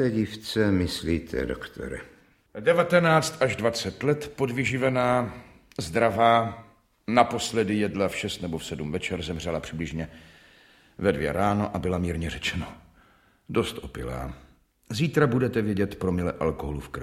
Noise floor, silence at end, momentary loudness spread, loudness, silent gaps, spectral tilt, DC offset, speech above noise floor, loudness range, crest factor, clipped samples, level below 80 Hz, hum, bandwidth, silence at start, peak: -60 dBFS; 0 s; 14 LU; -26 LUFS; none; -5.5 dB/octave; under 0.1%; 34 dB; 6 LU; 24 dB; under 0.1%; -46 dBFS; none; 16 kHz; 0 s; -4 dBFS